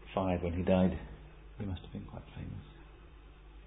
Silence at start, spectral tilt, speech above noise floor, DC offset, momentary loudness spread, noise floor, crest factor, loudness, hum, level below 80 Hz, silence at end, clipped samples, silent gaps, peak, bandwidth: 0 s; -7 dB/octave; 20 dB; under 0.1%; 27 LU; -54 dBFS; 22 dB; -35 LUFS; none; -48 dBFS; 0 s; under 0.1%; none; -14 dBFS; 3.9 kHz